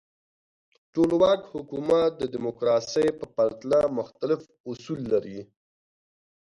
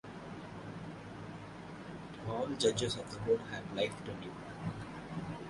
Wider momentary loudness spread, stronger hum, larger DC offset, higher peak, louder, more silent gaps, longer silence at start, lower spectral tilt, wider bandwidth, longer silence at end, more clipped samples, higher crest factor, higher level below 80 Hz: about the same, 13 LU vs 15 LU; neither; neither; first, -8 dBFS vs -16 dBFS; first, -26 LUFS vs -39 LUFS; first, 4.60-4.64 s vs none; first, 0.95 s vs 0.05 s; first, -6 dB/octave vs -4.5 dB/octave; about the same, 11 kHz vs 11.5 kHz; first, 1 s vs 0 s; neither; about the same, 18 dB vs 22 dB; about the same, -62 dBFS vs -62 dBFS